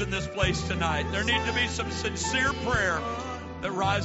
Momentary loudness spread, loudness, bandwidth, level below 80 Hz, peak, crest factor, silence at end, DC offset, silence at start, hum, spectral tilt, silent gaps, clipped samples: 8 LU; -27 LUFS; 8 kHz; -40 dBFS; -10 dBFS; 16 dB; 0 s; under 0.1%; 0 s; none; -3 dB/octave; none; under 0.1%